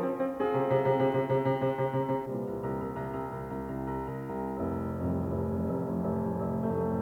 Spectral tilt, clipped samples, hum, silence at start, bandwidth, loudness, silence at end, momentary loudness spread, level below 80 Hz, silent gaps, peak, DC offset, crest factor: -9 dB/octave; under 0.1%; none; 0 s; 19 kHz; -31 LUFS; 0 s; 9 LU; -54 dBFS; none; -14 dBFS; under 0.1%; 16 dB